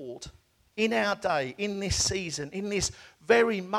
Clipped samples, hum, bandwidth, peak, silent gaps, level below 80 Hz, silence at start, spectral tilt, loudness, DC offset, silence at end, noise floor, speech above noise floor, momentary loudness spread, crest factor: under 0.1%; none; 15 kHz; -10 dBFS; none; -50 dBFS; 0 s; -3 dB/octave; -28 LUFS; under 0.1%; 0 s; -52 dBFS; 25 dB; 19 LU; 18 dB